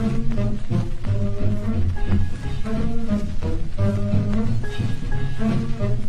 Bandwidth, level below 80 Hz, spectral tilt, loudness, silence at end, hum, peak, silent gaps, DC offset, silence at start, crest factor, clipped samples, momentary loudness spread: 7.4 kHz; -26 dBFS; -8 dB/octave; -25 LUFS; 0 s; none; -6 dBFS; none; under 0.1%; 0 s; 12 dB; under 0.1%; 5 LU